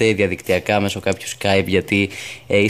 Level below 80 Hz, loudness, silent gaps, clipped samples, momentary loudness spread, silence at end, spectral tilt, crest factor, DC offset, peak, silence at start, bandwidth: -50 dBFS; -19 LUFS; none; under 0.1%; 6 LU; 0 s; -5 dB/octave; 16 dB; 0.2%; -4 dBFS; 0 s; 15.5 kHz